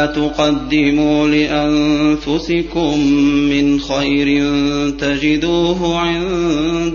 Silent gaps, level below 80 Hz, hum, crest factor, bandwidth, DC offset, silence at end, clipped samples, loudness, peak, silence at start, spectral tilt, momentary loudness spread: none; -34 dBFS; none; 12 dB; 7.2 kHz; under 0.1%; 0 s; under 0.1%; -15 LUFS; -2 dBFS; 0 s; -5.5 dB/octave; 4 LU